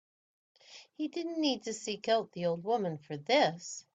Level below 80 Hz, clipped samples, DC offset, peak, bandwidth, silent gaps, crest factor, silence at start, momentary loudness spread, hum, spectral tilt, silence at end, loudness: -80 dBFS; under 0.1%; under 0.1%; -16 dBFS; 9.2 kHz; none; 18 dB; 0.7 s; 13 LU; none; -4 dB/octave; 0.15 s; -33 LUFS